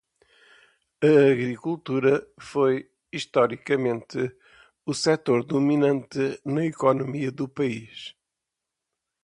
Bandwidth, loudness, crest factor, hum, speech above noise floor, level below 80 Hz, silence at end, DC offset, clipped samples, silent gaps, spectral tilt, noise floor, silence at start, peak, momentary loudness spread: 11 kHz; -24 LUFS; 18 dB; none; 62 dB; -68 dBFS; 1.15 s; under 0.1%; under 0.1%; none; -6 dB/octave; -85 dBFS; 1 s; -6 dBFS; 12 LU